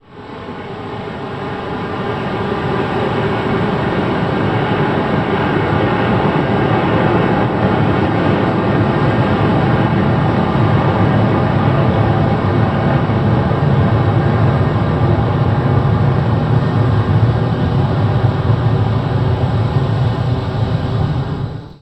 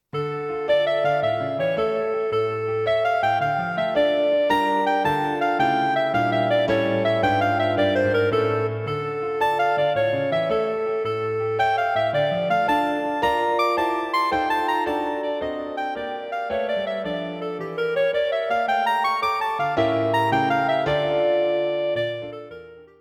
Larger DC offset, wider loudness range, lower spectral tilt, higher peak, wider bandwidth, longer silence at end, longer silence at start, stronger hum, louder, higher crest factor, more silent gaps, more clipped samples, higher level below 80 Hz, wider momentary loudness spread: neither; about the same, 3 LU vs 4 LU; first, -9 dB/octave vs -6 dB/octave; first, 0 dBFS vs -8 dBFS; second, 8.2 kHz vs 16 kHz; about the same, 0.05 s vs 0.15 s; about the same, 0.1 s vs 0.15 s; neither; first, -15 LUFS vs -22 LUFS; about the same, 14 dB vs 14 dB; neither; neither; first, -32 dBFS vs -56 dBFS; about the same, 7 LU vs 7 LU